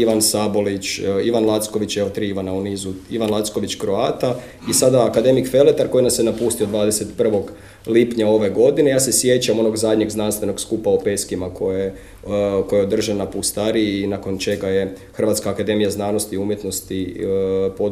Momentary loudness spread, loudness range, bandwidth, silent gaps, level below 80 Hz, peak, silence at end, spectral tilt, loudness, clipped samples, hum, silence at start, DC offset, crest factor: 9 LU; 4 LU; 16 kHz; none; -48 dBFS; 0 dBFS; 0 s; -4.5 dB/octave; -19 LUFS; under 0.1%; none; 0 s; 0.1%; 18 dB